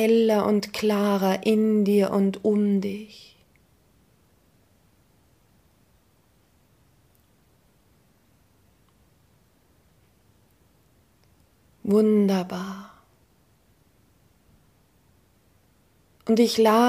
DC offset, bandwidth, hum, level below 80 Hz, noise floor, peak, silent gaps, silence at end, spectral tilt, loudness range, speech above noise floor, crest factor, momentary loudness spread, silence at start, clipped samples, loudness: under 0.1%; 15.5 kHz; none; -66 dBFS; -63 dBFS; -8 dBFS; none; 0 s; -6.5 dB/octave; 12 LU; 42 dB; 20 dB; 17 LU; 0 s; under 0.1%; -22 LUFS